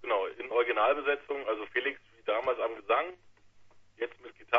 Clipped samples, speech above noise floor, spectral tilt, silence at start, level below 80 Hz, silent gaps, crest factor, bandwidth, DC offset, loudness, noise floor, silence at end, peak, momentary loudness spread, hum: under 0.1%; 26 dB; -5 dB/octave; 0 s; -70 dBFS; none; 22 dB; 6 kHz; under 0.1%; -31 LUFS; -57 dBFS; 0 s; -10 dBFS; 12 LU; none